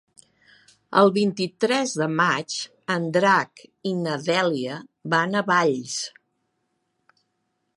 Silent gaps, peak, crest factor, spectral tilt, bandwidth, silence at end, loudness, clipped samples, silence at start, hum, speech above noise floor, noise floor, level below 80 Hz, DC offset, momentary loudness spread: none; -2 dBFS; 22 dB; -4.5 dB/octave; 11.5 kHz; 1.65 s; -23 LUFS; under 0.1%; 0.9 s; none; 52 dB; -75 dBFS; -74 dBFS; under 0.1%; 11 LU